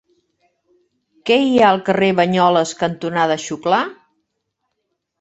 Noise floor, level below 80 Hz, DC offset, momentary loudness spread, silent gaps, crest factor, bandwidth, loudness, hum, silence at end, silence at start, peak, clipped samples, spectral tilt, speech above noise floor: -74 dBFS; -60 dBFS; under 0.1%; 8 LU; none; 18 dB; 8.2 kHz; -16 LUFS; none; 1.25 s; 1.25 s; -2 dBFS; under 0.1%; -5 dB/octave; 58 dB